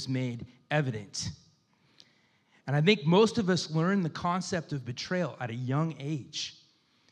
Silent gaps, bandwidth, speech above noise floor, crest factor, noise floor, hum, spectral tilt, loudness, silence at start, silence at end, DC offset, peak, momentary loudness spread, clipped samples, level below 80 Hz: none; 10 kHz; 38 dB; 22 dB; -67 dBFS; none; -5.5 dB/octave; -30 LUFS; 0 s; 0.6 s; under 0.1%; -8 dBFS; 13 LU; under 0.1%; -68 dBFS